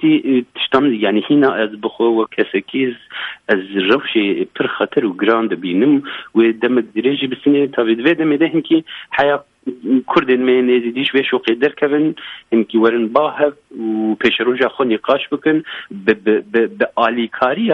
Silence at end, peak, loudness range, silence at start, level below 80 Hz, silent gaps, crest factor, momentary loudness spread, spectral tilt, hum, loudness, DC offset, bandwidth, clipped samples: 0 s; 0 dBFS; 2 LU; 0 s; -58 dBFS; none; 16 dB; 6 LU; -7.5 dB/octave; none; -16 LUFS; under 0.1%; 5.6 kHz; under 0.1%